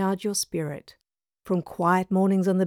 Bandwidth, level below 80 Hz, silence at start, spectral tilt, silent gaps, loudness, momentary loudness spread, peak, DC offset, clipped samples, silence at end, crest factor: 16 kHz; -64 dBFS; 0 s; -5.5 dB/octave; none; -25 LUFS; 10 LU; -10 dBFS; under 0.1%; under 0.1%; 0 s; 16 dB